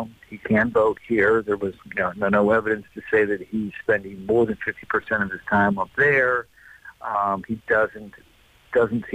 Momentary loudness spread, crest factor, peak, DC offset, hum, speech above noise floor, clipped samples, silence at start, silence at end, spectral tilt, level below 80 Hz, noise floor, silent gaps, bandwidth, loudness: 10 LU; 12 dB; -10 dBFS; under 0.1%; none; 24 dB; under 0.1%; 0 s; 0 s; -8 dB/octave; -54 dBFS; -46 dBFS; none; 9 kHz; -22 LUFS